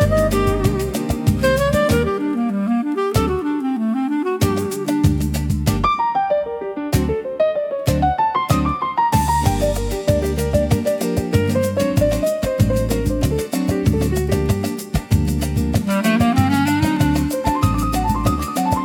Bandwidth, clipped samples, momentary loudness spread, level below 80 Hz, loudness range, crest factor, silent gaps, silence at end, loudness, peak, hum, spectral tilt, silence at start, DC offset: 17.5 kHz; under 0.1%; 4 LU; -28 dBFS; 2 LU; 14 dB; none; 0 s; -19 LUFS; -4 dBFS; none; -6.5 dB/octave; 0 s; under 0.1%